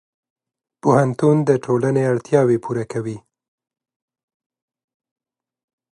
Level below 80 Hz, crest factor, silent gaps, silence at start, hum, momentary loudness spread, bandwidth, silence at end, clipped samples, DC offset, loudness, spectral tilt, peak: -64 dBFS; 20 dB; none; 0.85 s; none; 11 LU; 11 kHz; 2.75 s; under 0.1%; under 0.1%; -18 LUFS; -8 dB/octave; -2 dBFS